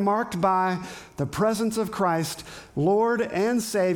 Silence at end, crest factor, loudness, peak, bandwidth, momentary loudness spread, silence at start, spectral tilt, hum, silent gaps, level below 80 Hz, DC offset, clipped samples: 0 s; 14 dB; -25 LUFS; -10 dBFS; 19 kHz; 10 LU; 0 s; -5.5 dB/octave; none; none; -58 dBFS; under 0.1%; under 0.1%